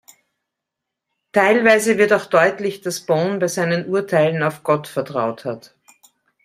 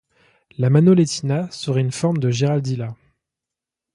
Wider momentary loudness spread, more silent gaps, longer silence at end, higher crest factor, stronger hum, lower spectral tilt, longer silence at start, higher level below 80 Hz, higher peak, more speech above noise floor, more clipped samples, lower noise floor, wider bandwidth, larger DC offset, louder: about the same, 11 LU vs 13 LU; neither; second, 0.85 s vs 1 s; about the same, 18 dB vs 16 dB; neither; second, -5 dB/octave vs -7 dB/octave; first, 1.35 s vs 0.6 s; second, -64 dBFS vs -58 dBFS; first, 0 dBFS vs -4 dBFS; second, 64 dB vs 68 dB; neither; second, -82 dBFS vs -86 dBFS; first, 15.5 kHz vs 11.5 kHz; neither; about the same, -18 LUFS vs -19 LUFS